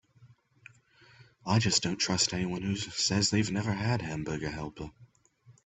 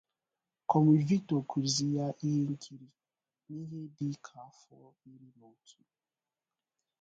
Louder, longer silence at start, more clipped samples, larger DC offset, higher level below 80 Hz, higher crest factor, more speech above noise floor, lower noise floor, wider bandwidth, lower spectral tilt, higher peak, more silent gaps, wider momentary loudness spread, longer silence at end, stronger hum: about the same, -29 LUFS vs -31 LUFS; second, 0.2 s vs 0.7 s; neither; neither; first, -58 dBFS vs -74 dBFS; about the same, 20 dB vs 22 dB; second, 31 dB vs over 57 dB; second, -61 dBFS vs under -90 dBFS; about the same, 8.4 kHz vs 9.2 kHz; second, -4 dB/octave vs -6 dB/octave; about the same, -12 dBFS vs -12 dBFS; neither; second, 14 LU vs 20 LU; second, 0.15 s vs 1.9 s; neither